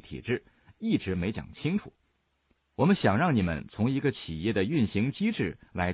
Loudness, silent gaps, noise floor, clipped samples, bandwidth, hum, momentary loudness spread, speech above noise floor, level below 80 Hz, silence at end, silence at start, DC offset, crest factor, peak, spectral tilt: -29 LUFS; none; -73 dBFS; under 0.1%; 4.9 kHz; none; 10 LU; 45 dB; -56 dBFS; 0 s; 0.05 s; under 0.1%; 18 dB; -10 dBFS; -6 dB/octave